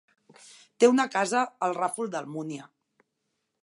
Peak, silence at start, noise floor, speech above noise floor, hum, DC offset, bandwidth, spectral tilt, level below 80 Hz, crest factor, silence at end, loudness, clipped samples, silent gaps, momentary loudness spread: -8 dBFS; 0.8 s; -80 dBFS; 54 dB; none; under 0.1%; 11.5 kHz; -4 dB/octave; -86 dBFS; 22 dB; 0.95 s; -26 LUFS; under 0.1%; none; 15 LU